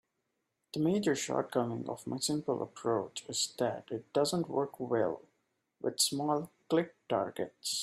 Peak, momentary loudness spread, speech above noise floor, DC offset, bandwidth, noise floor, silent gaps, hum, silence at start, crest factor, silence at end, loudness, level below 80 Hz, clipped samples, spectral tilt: -14 dBFS; 8 LU; 49 dB; under 0.1%; 15.5 kHz; -83 dBFS; none; none; 0.75 s; 20 dB; 0 s; -34 LUFS; -76 dBFS; under 0.1%; -4 dB/octave